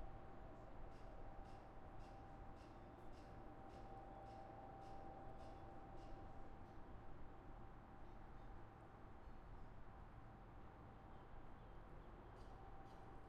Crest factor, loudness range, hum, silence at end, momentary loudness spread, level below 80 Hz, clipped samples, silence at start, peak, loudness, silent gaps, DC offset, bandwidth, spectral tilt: 14 dB; 3 LU; none; 0 s; 4 LU; -62 dBFS; under 0.1%; 0 s; -42 dBFS; -61 LUFS; none; under 0.1%; 9 kHz; -7.5 dB/octave